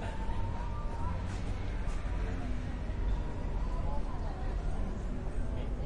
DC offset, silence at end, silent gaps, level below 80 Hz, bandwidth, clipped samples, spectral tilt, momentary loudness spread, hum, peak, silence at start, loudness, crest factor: under 0.1%; 0 s; none; -36 dBFS; 9.8 kHz; under 0.1%; -7 dB/octave; 2 LU; none; -22 dBFS; 0 s; -38 LUFS; 12 dB